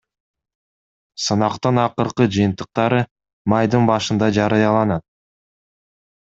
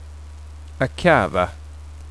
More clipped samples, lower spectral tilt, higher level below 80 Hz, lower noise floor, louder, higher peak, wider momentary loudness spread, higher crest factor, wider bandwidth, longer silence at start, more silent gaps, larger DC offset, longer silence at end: neither; about the same, -6 dB/octave vs -6 dB/octave; second, -54 dBFS vs -38 dBFS; first, under -90 dBFS vs -37 dBFS; about the same, -18 LUFS vs -20 LUFS; about the same, 0 dBFS vs -2 dBFS; second, 9 LU vs 23 LU; about the same, 20 dB vs 20 dB; second, 8 kHz vs 11 kHz; first, 1.2 s vs 0 s; first, 3.11-3.16 s, 3.33-3.45 s vs none; second, under 0.1% vs 0.4%; first, 1.35 s vs 0 s